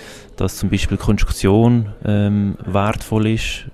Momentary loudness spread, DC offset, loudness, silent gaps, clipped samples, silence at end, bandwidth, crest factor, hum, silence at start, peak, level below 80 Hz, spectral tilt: 8 LU; under 0.1%; -18 LUFS; none; under 0.1%; 0 s; 14 kHz; 16 dB; none; 0 s; 0 dBFS; -28 dBFS; -6.5 dB/octave